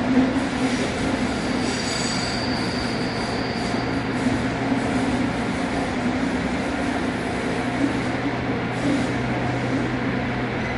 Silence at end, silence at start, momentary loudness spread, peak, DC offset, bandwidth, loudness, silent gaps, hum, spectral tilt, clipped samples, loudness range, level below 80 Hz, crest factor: 0 s; 0 s; 2 LU; -8 dBFS; under 0.1%; 11.5 kHz; -23 LUFS; none; none; -5 dB/octave; under 0.1%; 0 LU; -40 dBFS; 16 dB